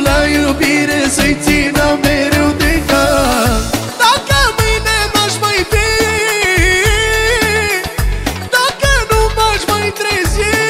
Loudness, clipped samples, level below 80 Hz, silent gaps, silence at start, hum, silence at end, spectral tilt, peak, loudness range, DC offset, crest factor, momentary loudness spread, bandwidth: -12 LUFS; under 0.1%; -22 dBFS; none; 0 s; none; 0 s; -3.5 dB/octave; 0 dBFS; 1 LU; under 0.1%; 12 dB; 4 LU; 16.5 kHz